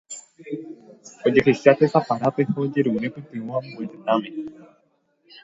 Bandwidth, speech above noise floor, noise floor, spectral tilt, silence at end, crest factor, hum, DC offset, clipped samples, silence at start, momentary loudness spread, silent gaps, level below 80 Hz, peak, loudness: 7.8 kHz; 44 dB; -66 dBFS; -6.5 dB/octave; 0.9 s; 22 dB; none; under 0.1%; under 0.1%; 0.1 s; 20 LU; none; -62 dBFS; 0 dBFS; -21 LUFS